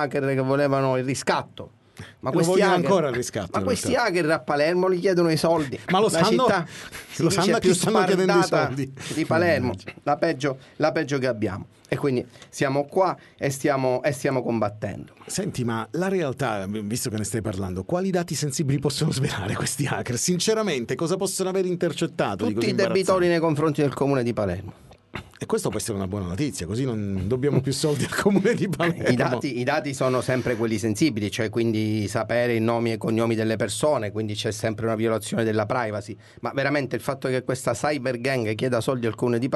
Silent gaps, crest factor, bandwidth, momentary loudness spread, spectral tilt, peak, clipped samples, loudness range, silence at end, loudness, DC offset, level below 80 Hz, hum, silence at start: none; 18 dB; 12 kHz; 9 LU; -5 dB/octave; -4 dBFS; under 0.1%; 5 LU; 0 s; -24 LUFS; under 0.1%; -56 dBFS; none; 0 s